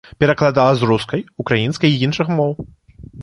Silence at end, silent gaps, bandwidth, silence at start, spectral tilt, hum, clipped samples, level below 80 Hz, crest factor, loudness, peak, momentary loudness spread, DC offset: 0 s; none; 11 kHz; 0.2 s; -6.5 dB/octave; none; under 0.1%; -46 dBFS; 16 dB; -17 LUFS; -2 dBFS; 10 LU; under 0.1%